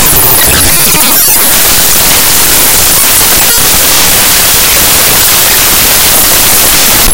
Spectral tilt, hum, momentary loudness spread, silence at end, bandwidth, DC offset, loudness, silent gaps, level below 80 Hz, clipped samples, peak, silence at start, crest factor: -0.5 dB/octave; none; 1 LU; 0 s; over 20 kHz; 8%; -2 LUFS; none; -22 dBFS; 10%; 0 dBFS; 0 s; 6 dB